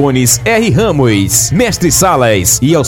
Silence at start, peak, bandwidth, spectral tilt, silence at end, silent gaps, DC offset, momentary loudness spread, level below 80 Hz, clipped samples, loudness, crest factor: 0 s; 0 dBFS; 17.5 kHz; -4 dB/octave; 0 s; none; under 0.1%; 2 LU; -30 dBFS; under 0.1%; -9 LUFS; 10 dB